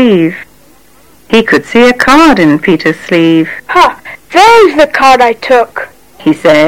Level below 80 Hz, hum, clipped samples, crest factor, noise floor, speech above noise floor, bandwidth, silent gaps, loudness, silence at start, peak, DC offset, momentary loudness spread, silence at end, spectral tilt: -38 dBFS; none; under 0.1%; 8 dB; -42 dBFS; 36 dB; 16.5 kHz; none; -7 LUFS; 0 s; 0 dBFS; under 0.1%; 11 LU; 0 s; -5 dB/octave